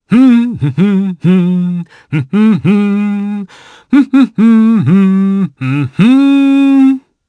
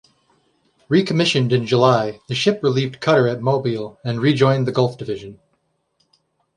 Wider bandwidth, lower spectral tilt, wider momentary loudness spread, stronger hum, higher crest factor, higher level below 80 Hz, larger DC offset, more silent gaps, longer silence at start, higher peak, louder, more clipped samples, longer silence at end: second, 9.2 kHz vs 10.5 kHz; first, -8.5 dB/octave vs -6 dB/octave; about the same, 10 LU vs 10 LU; neither; second, 10 dB vs 18 dB; first, -54 dBFS vs -60 dBFS; neither; neither; second, 0.1 s vs 0.9 s; about the same, 0 dBFS vs 0 dBFS; first, -10 LUFS vs -18 LUFS; neither; second, 0.3 s vs 1.25 s